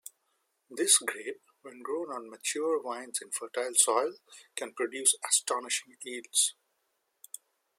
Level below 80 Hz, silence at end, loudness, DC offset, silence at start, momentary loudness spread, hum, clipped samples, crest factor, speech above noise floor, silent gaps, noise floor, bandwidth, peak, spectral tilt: under -90 dBFS; 1.3 s; -29 LUFS; under 0.1%; 0.7 s; 21 LU; none; under 0.1%; 26 dB; 47 dB; none; -78 dBFS; 16.5 kHz; -8 dBFS; 1 dB/octave